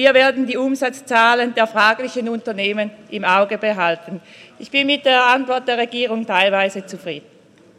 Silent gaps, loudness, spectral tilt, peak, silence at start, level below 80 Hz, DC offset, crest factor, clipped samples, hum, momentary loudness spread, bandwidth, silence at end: none; -17 LUFS; -3.5 dB/octave; -2 dBFS; 0 s; -72 dBFS; under 0.1%; 16 dB; under 0.1%; none; 14 LU; 13.5 kHz; 0.6 s